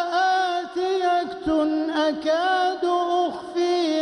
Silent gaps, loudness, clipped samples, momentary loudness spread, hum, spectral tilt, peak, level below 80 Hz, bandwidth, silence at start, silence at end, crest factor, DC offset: none; -23 LUFS; under 0.1%; 4 LU; none; -3.5 dB/octave; -12 dBFS; -56 dBFS; 10.5 kHz; 0 s; 0 s; 10 dB; under 0.1%